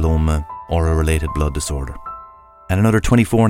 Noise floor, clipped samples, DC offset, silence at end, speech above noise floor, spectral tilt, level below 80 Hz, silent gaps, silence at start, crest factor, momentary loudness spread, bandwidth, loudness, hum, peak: -42 dBFS; under 0.1%; under 0.1%; 0 s; 26 dB; -6.5 dB/octave; -24 dBFS; none; 0 s; 18 dB; 15 LU; 16 kHz; -18 LUFS; none; 0 dBFS